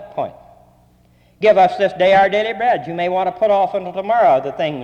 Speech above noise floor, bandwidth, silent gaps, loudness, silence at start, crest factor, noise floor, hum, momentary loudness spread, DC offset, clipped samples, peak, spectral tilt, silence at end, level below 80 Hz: 37 dB; 8.6 kHz; none; -16 LUFS; 0 s; 14 dB; -53 dBFS; 60 Hz at -55 dBFS; 10 LU; under 0.1%; under 0.1%; -2 dBFS; -6 dB/octave; 0 s; -54 dBFS